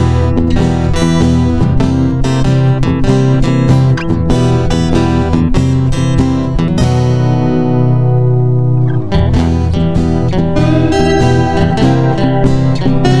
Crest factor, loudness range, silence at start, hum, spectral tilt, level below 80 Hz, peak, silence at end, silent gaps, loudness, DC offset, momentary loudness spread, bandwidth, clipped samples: 10 dB; 1 LU; 0 s; none; -7.5 dB/octave; -20 dBFS; 0 dBFS; 0 s; none; -11 LUFS; 6%; 2 LU; 11 kHz; under 0.1%